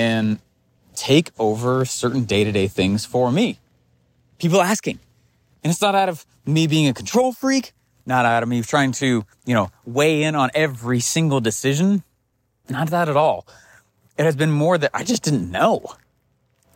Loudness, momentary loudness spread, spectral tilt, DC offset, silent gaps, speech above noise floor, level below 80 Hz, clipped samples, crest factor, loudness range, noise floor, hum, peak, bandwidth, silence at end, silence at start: -20 LUFS; 8 LU; -5 dB/octave; under 0.1%; none; 49 dB; -58 dBFS; under 0.1%; 16 dB; 2 LU; -68 dBFS; none; -4 dBFS; 16.5 kHz; 0.85 s; 0 s